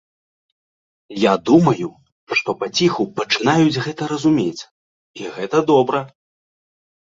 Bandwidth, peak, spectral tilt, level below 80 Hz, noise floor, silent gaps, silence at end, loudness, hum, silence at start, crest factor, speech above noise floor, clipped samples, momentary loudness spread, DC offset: 7.8 kHz; -2 dBFS; -5.5 dB/octave; -58 dBFS; under -90 dBFS; 2.12-2.27 s, 4.71-5.14 s; 1.15 s; -18 LUFS; none; 1.1 s; 18 dB; over 73 dB; under 0.1%; 16 LU; under 0.1%